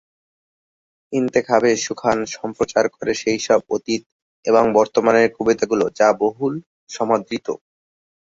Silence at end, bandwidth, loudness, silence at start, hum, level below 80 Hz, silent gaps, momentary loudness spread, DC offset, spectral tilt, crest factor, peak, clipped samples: 0.7 s; 7.8 kHz; -19 LUFS; 1.1 s; none; -58 dBFS; 4.06-4.43 s, 6.66-6.87 s; 11 LU; under 0.1%; -4.5 dB/octave; 18 dB; -2 dBFS; under 0.1%